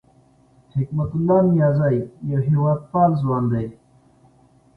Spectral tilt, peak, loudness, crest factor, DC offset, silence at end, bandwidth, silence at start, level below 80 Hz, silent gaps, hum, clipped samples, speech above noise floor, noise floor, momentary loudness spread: -12 dB/octave; -4 dBFS; -20 LUFS; 16 dB; under 0.1%; 1.05 s; 4.6 kHz; 0.75 s; -50 dBFS; none; none; under 0.1%; 36 dB; -55 dBFS; 9 LU